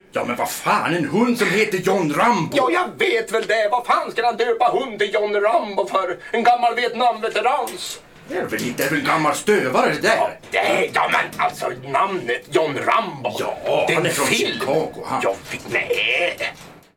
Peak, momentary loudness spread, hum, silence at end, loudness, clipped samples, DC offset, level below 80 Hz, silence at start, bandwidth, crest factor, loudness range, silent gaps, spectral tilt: -4 dBFS; 7 LU; none; 0.15 s; -20 LUFS; under 0.1%; under 0.1%; -58 dBFS; 0.15 s; 17.5 kHz; 16 dB; 2 LU; none; -4 dB/octave